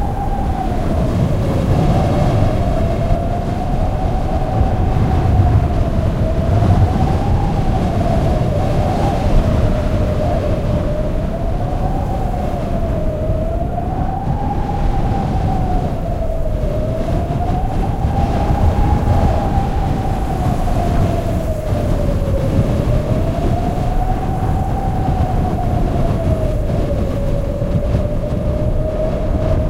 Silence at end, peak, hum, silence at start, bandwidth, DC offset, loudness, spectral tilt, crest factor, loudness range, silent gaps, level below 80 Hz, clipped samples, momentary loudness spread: 0 s; -2 dBFS; none; 0 s; 14 kHz; under 0.1%; -18 LUFS; -8.5 dB/octave; 14 dB; 4 LU; none; -20 dBFS; under 0.1%; 5 LU